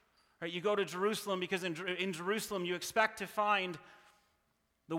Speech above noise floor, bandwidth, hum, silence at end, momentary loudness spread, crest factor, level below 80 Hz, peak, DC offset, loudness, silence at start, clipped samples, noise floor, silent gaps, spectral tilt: 43 dB; 17 kHz; none; 0 s; 7 LU; 22 dB; -78 dBFS; -16 dBFS; under 0.1%; -35 LUFS; 0.4 s; under 0.1%; -78 dBFS; none; -3.5 dB/octave